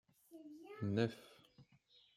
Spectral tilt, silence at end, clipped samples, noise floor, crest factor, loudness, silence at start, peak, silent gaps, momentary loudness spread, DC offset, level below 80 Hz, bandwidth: -7.5 dB/octave; 0.55 s; under 0.1%; -71 dBFS; 24 dB; -41 LUFS; 0.3 s; -22 dBFS; none; 24 LU; under 0.1%; -82 dBFS; 15 kHz